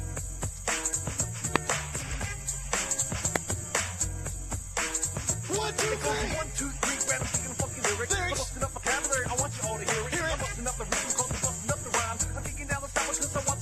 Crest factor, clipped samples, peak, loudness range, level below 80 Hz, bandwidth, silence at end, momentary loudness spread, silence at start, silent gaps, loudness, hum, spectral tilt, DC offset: 30 dB; under 0.1%; -2 dBFS; 1 LU; -42 dBFS; 13 kHz; 0 s; 6 LU; 0 s; none; -29 LUFS; none; -2.5 dB/octave; under 0.1%